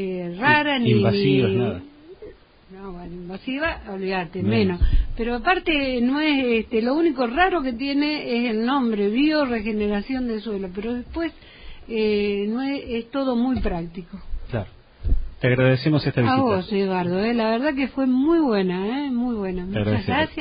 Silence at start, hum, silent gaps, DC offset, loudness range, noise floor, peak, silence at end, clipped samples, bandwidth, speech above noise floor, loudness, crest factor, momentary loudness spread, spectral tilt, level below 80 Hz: 0 s; none; none; under 0.1%; 5 LU; -46 dBFS; -4 dBFS; 0 s; under 0.1%; 5.2 kHz; 24 dB; -22 LUFS; 18 dB; 12 LU; -11.5 dB/octave; -34 dBFS